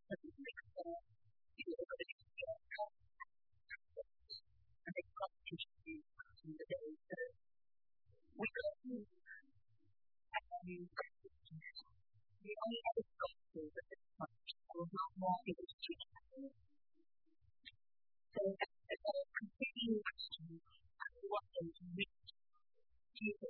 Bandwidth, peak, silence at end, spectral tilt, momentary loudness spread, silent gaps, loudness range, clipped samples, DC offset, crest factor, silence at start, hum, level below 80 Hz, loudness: 4.3 kHz; -26 dBFS; 0 s; -3 dB/octave; 17 LU; 2.12-2.18 s, 15.73-15.79 s; 7 LU; under 0.1%; under 0.1%; 24 dB; 0.1 s; none; -80 dBFS; -48 LUFS